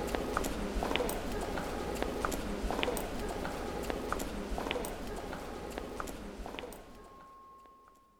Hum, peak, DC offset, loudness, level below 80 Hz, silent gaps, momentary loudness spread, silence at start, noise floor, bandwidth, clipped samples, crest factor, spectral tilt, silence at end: none; -12 dBFS; under 0.1%; -38 LUFS; -44 dBFS; none; 18 LU; 0 s; -61 dBFS; over 20 kHz; under 0.1%; 26 dB; -4.5 dB/octave; 0.25 s